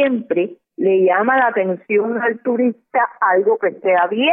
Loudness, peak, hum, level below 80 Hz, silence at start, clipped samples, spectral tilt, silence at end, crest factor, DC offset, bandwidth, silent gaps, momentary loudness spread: -17 LUFS; -4 dBFS; none; -80 dBFS; 0 s; under 0.1%; -10 dB/octave; 0 s; 12 dB; under 0.1%; 3.7 kHz; none; 6 LU